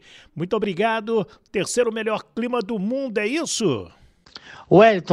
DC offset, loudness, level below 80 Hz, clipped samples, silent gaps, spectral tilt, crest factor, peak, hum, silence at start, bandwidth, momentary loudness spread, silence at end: under 0.1%; -22 LUFS; -58 dBFS; under 0.1%; none; -5 dB/octave; 18 dB; -2 dBFS; none; 0.35 s; 14 kHz; 14 LU; 0 s